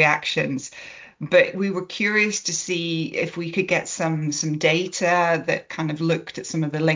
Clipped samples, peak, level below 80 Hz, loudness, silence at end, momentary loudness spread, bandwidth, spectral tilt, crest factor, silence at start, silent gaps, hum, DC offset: under 0.1%; -4 dBFS; -66 dBFS; -22 LUFS; 0 s; 9 LU; 7.8 kHz; -4 dB/octave; 20 dB; 0 s; none; none; under 0.1%